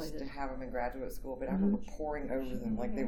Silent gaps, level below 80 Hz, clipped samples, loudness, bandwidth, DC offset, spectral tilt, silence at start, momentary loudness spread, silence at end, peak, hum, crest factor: none; -46 dBFS; under 0.1%; -37 LUFS; 18.5 kHz; under 0.1%; -7.5 dB/octave; 0 s; 9 LU; 0 s; -20 dBFS; none; 16 dB